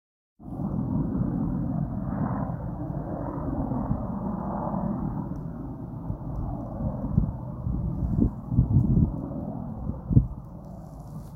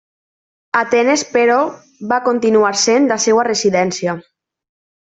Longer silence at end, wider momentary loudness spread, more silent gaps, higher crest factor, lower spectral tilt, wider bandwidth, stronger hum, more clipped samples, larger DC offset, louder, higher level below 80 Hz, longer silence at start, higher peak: second, 0 s vs 0.95 s; first, 13 LU vs 9 LU; neither; first, 24 dB vs 14 dB; first, -12.5 dB/octave vs -3 dB/octave; second, 2.1 kHz vs 8.4 kHz; neither; neither; neither; second, -29 LUFS vs -15 LUFS; first, -36 dBFS vs -62 dBFS; second, 0.4 s vs 0.75 s; about the same, -4 dBFS vs -2 dBFS